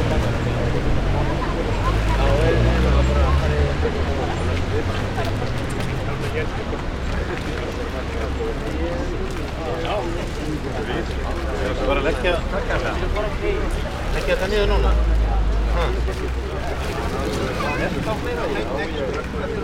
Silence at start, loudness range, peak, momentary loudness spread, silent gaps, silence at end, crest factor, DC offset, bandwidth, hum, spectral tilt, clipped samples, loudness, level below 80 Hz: 0 s; 6 LU; -6 dBFS; 8 LU; none; 0 s; 16 dB; under 0.1%; 14 kHz; none; -6 dB/octave; under 0.1%; -23 LUFS; -24 dBFS